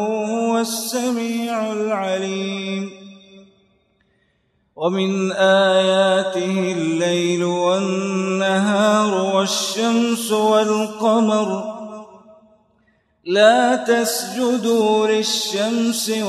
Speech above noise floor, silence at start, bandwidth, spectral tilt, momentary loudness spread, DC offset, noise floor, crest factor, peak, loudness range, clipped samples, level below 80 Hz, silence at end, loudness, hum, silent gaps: 47 dB; 0 s; 13 kHz; -4 dB/octave; 9 LU; under 0.1%; -65 dBFS; 18 dB; -2 dBFS; 7 LU; under 0.1%; -70 dBFS; 0 s; -18 LUFS; none; none